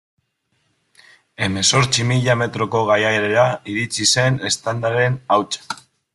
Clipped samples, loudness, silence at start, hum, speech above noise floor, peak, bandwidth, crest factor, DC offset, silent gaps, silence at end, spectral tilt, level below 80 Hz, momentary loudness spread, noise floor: under 0.1%; -18 LUFS; 1.4 s; none; 50 dB; -2 dBFS; 12 kHz; 18 dB; under 0.1%; none; 0.4 s; -3.5 dB/octave; -52 dBFS; 9 LU; -68 dBFS